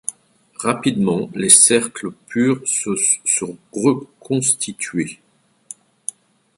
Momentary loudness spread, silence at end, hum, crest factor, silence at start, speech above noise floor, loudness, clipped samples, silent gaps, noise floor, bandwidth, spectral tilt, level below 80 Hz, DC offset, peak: 20 LU; 1.45 s; none; 20 dB; 0.1 s; 30 dB; -16 LUFS; under 0.1%; none; -48 dBFS; 16 kHz; -3 dB/octave; -62 dBFS; under 0.1%; 0 dBFS